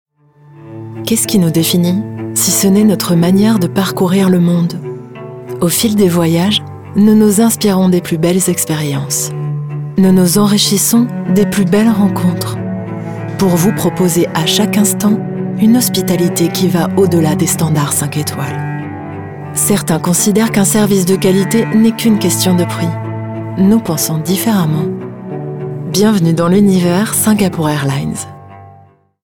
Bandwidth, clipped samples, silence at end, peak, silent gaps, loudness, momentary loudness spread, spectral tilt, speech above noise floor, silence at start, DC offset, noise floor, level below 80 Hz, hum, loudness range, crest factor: 19.5 kHz; under 0.1%; 0.55 s; 0 dBFS; none; -12 LUFS; 12 LU; -5 dB/octave; 33 dB; 0.55 s; under 0.1%; -44 dBFS; -48 dBFS; none; 3 LU; 12 dB